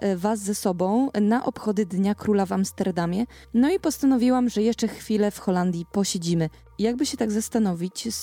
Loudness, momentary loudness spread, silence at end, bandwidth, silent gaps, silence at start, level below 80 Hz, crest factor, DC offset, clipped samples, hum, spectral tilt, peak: -24 LUFS; 5 LU; 0 s; 17.5 kHz; none; 0 s; -54 dBFS; 14 dB; under 0.1%; under 0.1%; none; -5.5 dB/octave; -10 dBFS